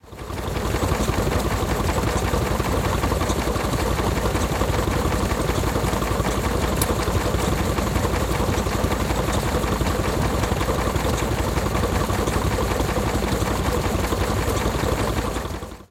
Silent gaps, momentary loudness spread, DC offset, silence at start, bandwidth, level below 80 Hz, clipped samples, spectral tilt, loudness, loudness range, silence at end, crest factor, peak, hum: none; 1 LU; under 0.1%; 0.05 s; 17 kHz; -28 dBFS; under 0.1%; -5 dB/octave; -23 LUFS; 0 LU; 0.05 s; 18 dB; -4 dBFS; none